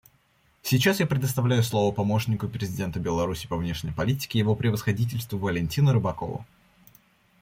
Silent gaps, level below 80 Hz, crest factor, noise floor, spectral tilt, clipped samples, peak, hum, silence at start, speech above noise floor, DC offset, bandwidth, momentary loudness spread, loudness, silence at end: none; -50 dBFS; 18 dB; -64 dBFS; -6 dB/octave; under 0.1%; -8 dBFS; none; 0.65 s; 39 dB; under 0.1%; 16.5 kHz; 8 LU; -26 LUFS; 0.95 s